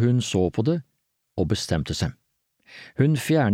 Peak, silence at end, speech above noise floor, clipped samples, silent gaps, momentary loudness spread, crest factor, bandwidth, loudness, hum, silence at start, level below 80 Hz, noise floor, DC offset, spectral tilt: -10 dBFS; 0 s; 51 dB; under 0.1%; none; 12 LU; 14 dB; 16 kHz; -24 LUFS; none; 0 s; -46 dBFS; -74 dBFS; under 0.1%; -6 dB/octave